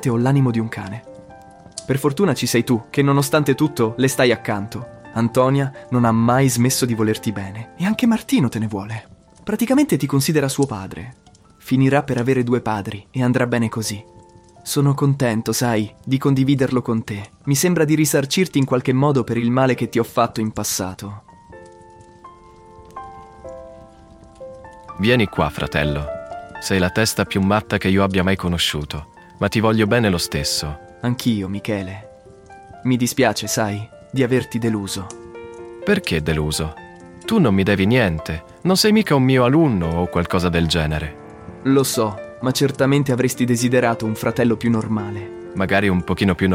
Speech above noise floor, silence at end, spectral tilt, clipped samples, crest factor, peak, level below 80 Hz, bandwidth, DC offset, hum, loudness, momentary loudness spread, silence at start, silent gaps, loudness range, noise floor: 28 dB; 0 s; -5.5 dB/octave; under 0.1%; 18 dB; -2 dBFS; -42 dBFS; 16.5 kHz; under 0.1%; none; -19 LUFS; 16 LU; 0 s; none; 5 LU; -46 dBFS